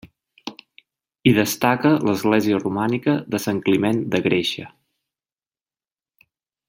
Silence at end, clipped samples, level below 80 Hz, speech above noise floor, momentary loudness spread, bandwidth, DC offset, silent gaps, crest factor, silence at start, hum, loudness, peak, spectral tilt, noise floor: 2 s; under 0.1%; -60 dBFS; over 71 dB; 19 LU; 16.5 kHz; under 0.1%; none; 20 dB; 0.05 s; none; -20 LUFS; -2 dBFS; -5.5 dB/octave; under -90 dBFS